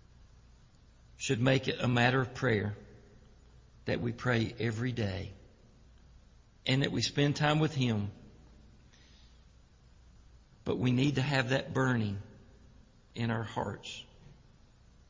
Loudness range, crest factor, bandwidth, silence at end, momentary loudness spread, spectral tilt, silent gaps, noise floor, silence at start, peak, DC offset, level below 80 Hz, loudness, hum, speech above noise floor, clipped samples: 5 LU; 22 dB; 7.6 kHz; 0.75 s; 15 LU; -6 dB/octave; none; -60 dBFS; 1.2 s; -12 dBFS; under 0.1%; -56 dBFS; -32 LUFS; none; 29 dB; under 0.1%